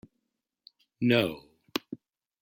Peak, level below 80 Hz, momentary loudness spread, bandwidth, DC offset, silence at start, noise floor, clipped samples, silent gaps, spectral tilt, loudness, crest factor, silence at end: -10 dBFS; -70 dBFS; 21 LU; 16.5 kHz; under 0.1%; 1 s; -83 dBFS; under 0.1%; none; -6 dB/octave; -29 LUFS; 22 dB; 0.45 s